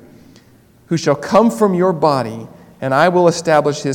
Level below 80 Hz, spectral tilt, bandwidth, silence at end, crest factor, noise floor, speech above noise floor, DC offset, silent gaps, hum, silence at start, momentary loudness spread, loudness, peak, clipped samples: -56 dBFS; -6 dB/octave; 17.5 kHz; 0 s; 16 dB; -48 dBFS; 34 dB; under 0.1%; none; none; 0.9 s; 11 LU; -14 LUFS; 0 dBFS; 0.2%